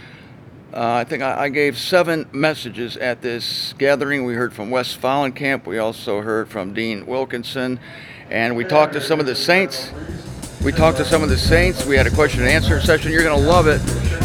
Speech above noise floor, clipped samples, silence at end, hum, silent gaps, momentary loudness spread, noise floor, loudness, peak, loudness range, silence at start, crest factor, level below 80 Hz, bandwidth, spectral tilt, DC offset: 23 dB; under 0.1%; 0 s; none; none; 11 LU; -41 dBFS; -18 LUFS; 0 dBFS; 6 LU; 0 s; 18 dB; -30 dBFS; 18 kHz; -5 dB/octave; under 0.1%